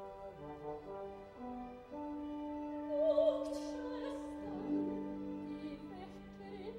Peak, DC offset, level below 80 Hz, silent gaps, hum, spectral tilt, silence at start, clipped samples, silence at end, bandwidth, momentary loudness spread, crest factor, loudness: -22 dBFS; under 0.1%; -64 dBFS; none; none; -7 dB/octave; 0 s; under 0.1%; 0 s; 11 kHz; 16 LU; 20 dB; -41 LUFS